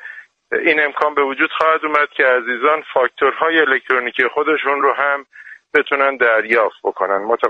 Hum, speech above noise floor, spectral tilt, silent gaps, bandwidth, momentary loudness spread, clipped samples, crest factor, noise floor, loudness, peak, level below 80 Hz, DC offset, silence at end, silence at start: none; 21 dB; -4.5 dB/octave; none; 7 kHz; 5 LU; under 0.1%; 16 dB; -37 dBFS; -16 LUFS; 0 dBFS; -64 dBFS; under 0.1%; 0 s; 0.05 s